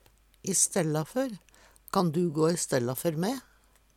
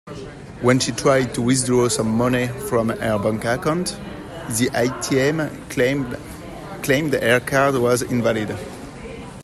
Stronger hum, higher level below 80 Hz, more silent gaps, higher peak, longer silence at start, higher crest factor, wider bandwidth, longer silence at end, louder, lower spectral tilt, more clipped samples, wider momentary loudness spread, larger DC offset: neither; second, -64 dBFS vs -46 dBFS; neither; second, -12 dBFS vs -2 dBFS; first, 0.45 s vs 0.05 s; about the same, 18 dB vs 18 dB; first, 17.5 kHz vs 15.5 kHz; first, 0.55 s vs 0 s; second, -28 LUFS vs -20 LUFS; about the same, -4.5 dB/octave vs -5 dB/octave; neither; second, 11 LU vs 17 LU; neither